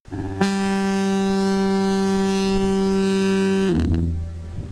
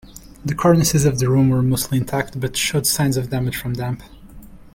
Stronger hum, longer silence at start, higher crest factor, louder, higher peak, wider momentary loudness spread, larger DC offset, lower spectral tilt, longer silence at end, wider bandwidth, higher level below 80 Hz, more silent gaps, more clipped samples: neither; about the same, 0.1 s vs 0.05 s; about the same, 14 dB vs 16 dB; about the same, -20 LUFS vs -19 LUFS; about the same, -6 dBFS vs -4 dBFS; second, 6 LU vs 11 LU; first, 0.2% vs under 0.1%; first, -6.5 dB/octave vs -5 dB/octave; about the same, 0 s vs 0.1 s; second, 11 kHz vs 17 kHz; first, -34 dBFS vs -40 dBFS; neither; neither